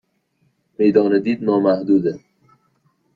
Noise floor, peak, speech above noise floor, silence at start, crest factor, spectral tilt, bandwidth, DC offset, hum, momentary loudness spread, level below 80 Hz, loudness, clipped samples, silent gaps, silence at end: -65 dBFS; -2 dBFS; 49 dB; 0.8 s; 18 dB; -9 dB/octave; 5 kHz; under 0.1%; none; 6 LU; -62 dBFS; -17 LUFS; under 0.1%; none; 1 s